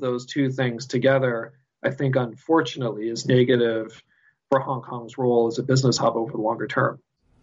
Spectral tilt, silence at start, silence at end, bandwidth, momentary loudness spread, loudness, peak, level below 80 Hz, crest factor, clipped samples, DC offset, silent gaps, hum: -6 dB/octave; 0 s; 0.45 s; 8 kHz; 10 LU; -23 LUFS; -6 dBFS; -66 dBFS; 16 dB; under 0.1%; under 0.1%; none; none